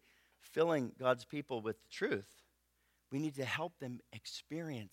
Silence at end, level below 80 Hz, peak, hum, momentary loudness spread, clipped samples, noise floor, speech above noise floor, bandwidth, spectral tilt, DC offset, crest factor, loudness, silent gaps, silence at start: 0.05 s; -80 dBFS; -18 dBFS; 60 Hz at -70 dBFS; 13 LU; under 0.1%; -78 dBFS; 39 dB; 16.5 kHz; -5.5 dB/octave; under 0.1%; 22 dB; -39 LUFS; none; 0.45 s